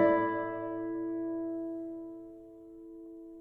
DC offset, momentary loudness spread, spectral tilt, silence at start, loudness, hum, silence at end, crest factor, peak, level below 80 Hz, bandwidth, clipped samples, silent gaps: under 0.1%; 19 LU; -9 dB/octave; 0 s; -35 LUFS; none; 0 s; 20 dB; -14 dBFS; -68 dBFS; 3.8 kHz; under 0.1%; none